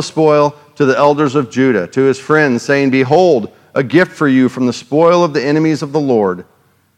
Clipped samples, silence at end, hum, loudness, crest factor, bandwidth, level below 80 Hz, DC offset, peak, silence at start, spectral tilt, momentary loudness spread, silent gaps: 0.1%; 0.55 s; none; -13 LUFS; 12 dB; 11 kHz; -62 dBFS; under 0.1%; 0 dBFS; 0 s; -6.5 dB/octave; 6 LU; none